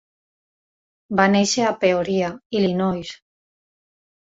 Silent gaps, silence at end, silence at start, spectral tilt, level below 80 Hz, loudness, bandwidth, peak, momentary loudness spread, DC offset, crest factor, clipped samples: 2.46-2.50 s; 1.1 s; 1.1 s; -4.5 dB/octave; -58 dBFS; -20 LUFS; 7.8 kHz; -2 dBFS; 8 LU; under 0.1%; 20 dB; under 0.1%